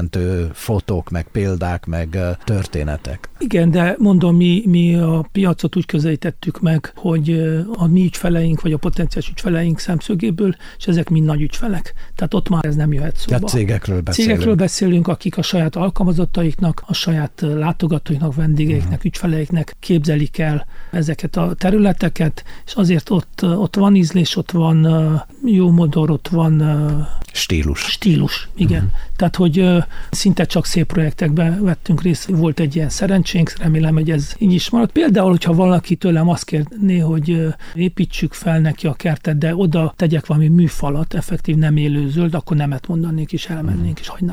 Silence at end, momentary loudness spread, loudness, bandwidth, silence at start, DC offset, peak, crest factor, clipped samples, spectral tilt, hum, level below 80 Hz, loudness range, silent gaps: 0 s; 8 LU; -17 LUFS; 15 kHz; 0 s; under 0.1%; -4 dBFS; 12 dB; under 0.1%; -7 dB/octave; none; -30 dBFS; 4 LU; none